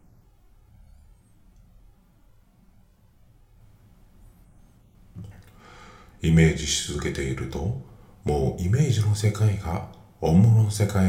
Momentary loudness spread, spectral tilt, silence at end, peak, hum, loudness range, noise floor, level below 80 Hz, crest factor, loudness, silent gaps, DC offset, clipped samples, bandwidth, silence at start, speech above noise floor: 18 LU; -6 dB/octave; 0 s; -4 dBFS; none; 4 LU; -57 dBFS; -44 dBFS; 20 dB; -23 LUFS; none; under 0.1%; under 0.1%; 15 kHz; 5.15 s; 35 dB